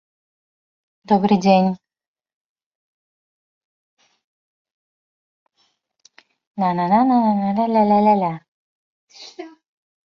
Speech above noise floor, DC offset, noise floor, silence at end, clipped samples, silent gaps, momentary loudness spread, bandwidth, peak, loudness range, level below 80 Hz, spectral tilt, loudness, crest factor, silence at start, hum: 51 dB; under 0.1%; -67 dBFS; 0.6 s; under 0.1%; 2.08-2.15 s, 2.34-2.56 s, 2.66-3.97 s, 4.24-4.65 s, 4.71-5.46 s, 6.47-6.54 s, 8.48-9.07 s; 22 LU; 6.8 kHz; -2 dBFS; 7 LU; -64 dBFS; -7.5 dB/octave; -17 LUFS; 20 dB; 1.1 s; none